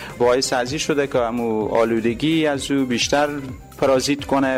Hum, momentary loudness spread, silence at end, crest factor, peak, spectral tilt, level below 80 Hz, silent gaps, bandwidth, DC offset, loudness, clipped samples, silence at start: none; 4 LU; 0 s; 14 dB; -6 dBFS; -4 dB/octave; -46 dBFS; none; 16 kHz; under 0.1%; -20 LUFS; under 0.1%; 0 s